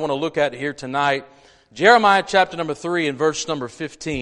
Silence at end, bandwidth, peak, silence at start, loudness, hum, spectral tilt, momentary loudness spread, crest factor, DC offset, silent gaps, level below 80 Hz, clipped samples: 0 s; 11 kHz; 0 dBFS; 0 s; -19 LUFS; none; -4 dB/octave; 13 LU; 20 dB; under 0.1%; none; -54 dBFS; under 0.1%